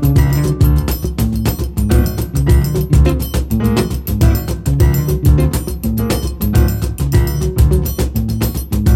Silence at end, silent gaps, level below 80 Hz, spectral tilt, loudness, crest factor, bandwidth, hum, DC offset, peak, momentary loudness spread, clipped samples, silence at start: 0 s; none; -18 dBFS; -7 dB/octave; -15 LUFS; 12 dB; 17 kHz; none; under 0.1%; 0 dBFS; 6 LU; under 0.1%; 0 s